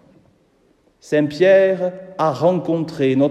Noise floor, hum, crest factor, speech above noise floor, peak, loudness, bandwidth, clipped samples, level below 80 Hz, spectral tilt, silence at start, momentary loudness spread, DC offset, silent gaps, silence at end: -58 dBFS; none; 16 dB; 42 dB; -2 dBFS; -17 LUFS; 9.2 kHz; under 0.1%; -64 dBFS; -7 dB/octave; 1.05 s; 9 LU; under 0.1%; none; 0 s